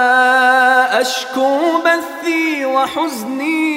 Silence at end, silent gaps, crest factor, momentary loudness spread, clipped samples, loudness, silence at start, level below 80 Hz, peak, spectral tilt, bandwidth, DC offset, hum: 0 s; none; 14 dB; 8 LU; under 0.1%; -14 LUFS; 0 s; -66 dBFS; 0 dBFS; -2 dB/octave; 16 kHz; under 0.1%; none